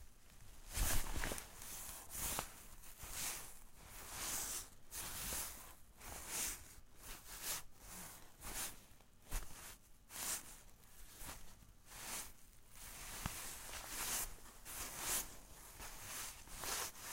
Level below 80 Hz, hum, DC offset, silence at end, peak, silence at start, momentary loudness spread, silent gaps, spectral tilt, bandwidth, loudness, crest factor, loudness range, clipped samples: -54 dBFS; none; under 0.1%; 0 s; -22 dBFS; 0 s; 18 LU; none; -1.5 dB/octave; 16 kHz; -45 LUFS; 26 dB; 5 LU; under 0.1%